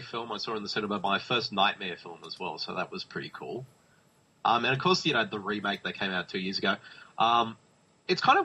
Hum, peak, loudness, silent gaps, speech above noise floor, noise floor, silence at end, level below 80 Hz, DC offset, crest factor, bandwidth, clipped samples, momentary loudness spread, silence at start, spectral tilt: none; -10 dBFS; -29 LUFS; none; 35 dB; -64 dBFS; 0 s; -70 dBFS; under 0.1%; 20 dB; 10.5 kHz; under 0.1%; 13 LU; 0 s; -4.5 dB/octave